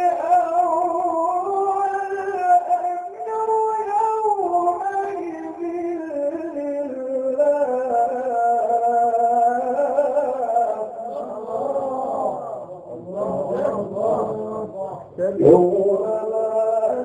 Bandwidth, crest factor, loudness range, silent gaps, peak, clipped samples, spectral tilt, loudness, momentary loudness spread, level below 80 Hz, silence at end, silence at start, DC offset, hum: 9.6 kHz; 20 dB; 6 LU; none; 0 dBFS; under 0.1%; -8 dB/octave; -21 LUFS; 11 LU; -64 dBFS; 0 s; 0 s; under 0.1%; none